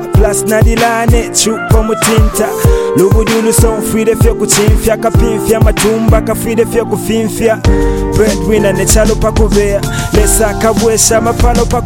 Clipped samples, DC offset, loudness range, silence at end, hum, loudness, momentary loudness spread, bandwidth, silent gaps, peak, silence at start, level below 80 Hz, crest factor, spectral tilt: under 0.1%; under 0.1%; 1 LU; 0 s; none; -10 LUFS; 4 LU; 17.5 kHz; none; 0 dBFS; 0 s; -16 dBFS; 10 dB; -5 dB/octave